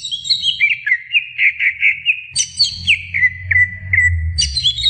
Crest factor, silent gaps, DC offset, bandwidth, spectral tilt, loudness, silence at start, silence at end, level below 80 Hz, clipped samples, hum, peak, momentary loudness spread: 14 dB; none; under 0.1%; 9.6 kHz; 0.5 dB/octave; -14 LUFS; 0 s; 0 s; -34 dBFS; under 0.1%; none; -2 dBFS; 4 LU